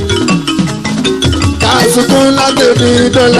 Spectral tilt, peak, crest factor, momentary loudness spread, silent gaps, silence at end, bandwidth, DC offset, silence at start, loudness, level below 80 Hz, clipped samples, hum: -4.5 dB/octave; 0 dBFS; 8 dB; 6 LU; none; 0 s; 15 kHz; under 0.1%; 0 s; -9 LUFS; -30 dBFS; under 0.1%; none